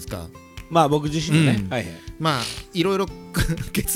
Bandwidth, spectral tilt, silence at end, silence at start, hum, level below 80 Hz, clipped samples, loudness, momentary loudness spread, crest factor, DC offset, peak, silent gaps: 17 kHz; -5 dB/octave; 0 s; 0 s; none; -38 dBFS; under 0.1%; -22 LUFS; 15 LU; 20 dB; under 0.1%; -2 dBFS; none